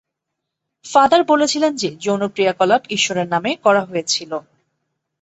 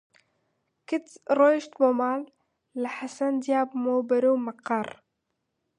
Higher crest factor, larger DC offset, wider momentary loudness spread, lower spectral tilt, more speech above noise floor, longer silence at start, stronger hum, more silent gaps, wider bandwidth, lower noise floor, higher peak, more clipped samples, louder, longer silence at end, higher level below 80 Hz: about the same, 18 dB vs 18 dB; neither; second, 8 LU vs 12 LU; second, -3.5 dB/octave vs -5 dB/octave; first, 62 dB vs 54 dB; about the same, 0.85 s vs 0.9 s; neither; neither; second, 8.2 kHz vs 10.5 kHz; about the same, -79 dBFS vs -80 dBFS; first, 0 dBFS vs -8 dBFS; neither; first, -17 LUFS vs -26 LUFS; about the same, 0.8 s vs 0.9 s; first, -62 dBFS vs -80 dBFS